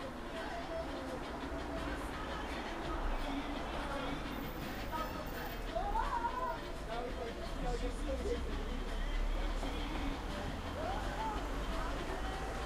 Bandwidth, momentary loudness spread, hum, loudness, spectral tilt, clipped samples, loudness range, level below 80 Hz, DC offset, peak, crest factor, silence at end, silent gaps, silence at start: 15.5 kHz; 4 LU; none; -41 LUFS; -5 dB/octave; under 0.1%; 1 LU; -42 dBFS; under 0.1%; -24 dBFS; 14 dB; 0 s; none; 0 s